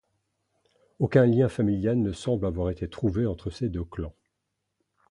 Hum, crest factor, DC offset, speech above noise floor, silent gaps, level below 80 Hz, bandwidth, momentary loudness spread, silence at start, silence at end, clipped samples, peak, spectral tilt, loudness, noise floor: none; 22 dB; under 0.1%; 56 dB; none; -44 dBFS; 11 kHz; 12 LU; 1 s; 1 s; under 0.1%; -4 dBFS; -8.5 dB/octave; -26 LUFS; -81 dBFS